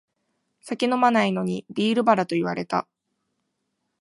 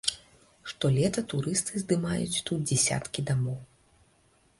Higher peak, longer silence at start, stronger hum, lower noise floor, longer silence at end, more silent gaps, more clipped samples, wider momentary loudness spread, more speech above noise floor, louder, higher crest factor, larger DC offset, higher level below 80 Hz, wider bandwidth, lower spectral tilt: first, -4 dBFS vs -8 dBFS; first, 0.65 s vs 0.05 s; neither; first, -77 dBFS vs -65 dBFS; first, 1.2 s vs 0.95 s; neither; neither; second, 9 LU vs 13 LU; first, 55 dB vs 36 dB; first, -23 LUFS vs -28 LUFS; about the same, 20 dB vs 22 dB; neither; second, -70 dBFS vs -58 dBFS; about the same, 11.5 kHz vs 11.5 kHz; first, -6 dB/octave vs -4.5 dB/octave